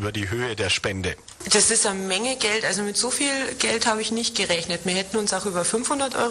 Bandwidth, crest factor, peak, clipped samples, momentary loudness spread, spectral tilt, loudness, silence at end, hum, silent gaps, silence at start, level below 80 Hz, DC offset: 13 kHz; 18 dB; -6 dBFS; under 0.1%; 9 LU; -2 dB/octave; -22 LUFS; 0 s; none; none; 0 s; -52 dBFS; under 0.1%